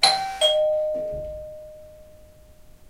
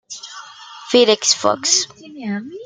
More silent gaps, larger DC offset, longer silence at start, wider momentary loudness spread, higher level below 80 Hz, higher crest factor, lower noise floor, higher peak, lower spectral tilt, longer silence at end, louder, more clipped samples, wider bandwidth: neither; neither; about the same, 0 s vs 0.1 s; about the same, 22 LU vs 22 LU; first, -48 dBFS vs -68 dBFS; about the same, 22 dB vs 18 dB; first, -49 dBFS vs -38 dBFS; about the same, -2 dBFS vs 0 dBFS; about the same, -1 dB/octave vs -1.5 dB/octave; about the same, 0.05 s vs 0 s; second, -22 LUFS vs -16 LUFS; neither; first, 16 kHz vs 10 kHz